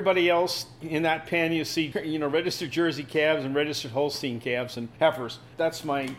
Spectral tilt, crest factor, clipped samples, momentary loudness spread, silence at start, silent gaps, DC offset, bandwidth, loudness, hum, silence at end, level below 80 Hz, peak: -4.5 dB/octave; 18 dB; under 0.1%; 6 LU; 0 s; none; under 0.1%; 16.5 kHz; -27 LUFS; none; 0 s; -62 dBFS; -10 dBFS